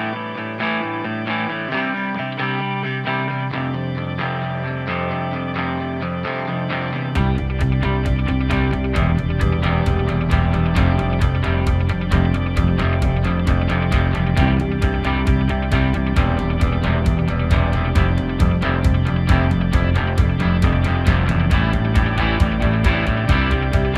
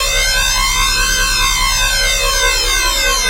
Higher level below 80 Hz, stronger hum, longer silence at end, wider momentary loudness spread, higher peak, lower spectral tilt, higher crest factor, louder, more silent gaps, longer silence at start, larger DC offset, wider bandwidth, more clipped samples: about the same, -24 dBFS vs -22 dBFS; neither; about the same, 0 s vs 0 s; first, 6 LU vs 0 LU; about the same, -2 dBFS vs 0 dBFS; first, -7.5 dB/octave vs 0 dB/octave; about the same, 16 dB vs 14 dB; second, -19 LUFS vs -12 LUFS; neither; about the same, 0 s vs 0 s; neither; second, 11 kHz vs 16 kHz; neither